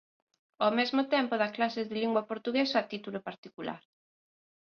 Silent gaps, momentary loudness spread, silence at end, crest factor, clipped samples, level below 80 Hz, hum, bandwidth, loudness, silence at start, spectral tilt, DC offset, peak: 3.38-3.43 s; 13 LU; 1 s; 20 dB; under 0.1%; -78 dBFS; none; 7 kHz; -31 LUFS; 0.6 s; -5.5 dB/octave; under 0.1%; -14 dBFS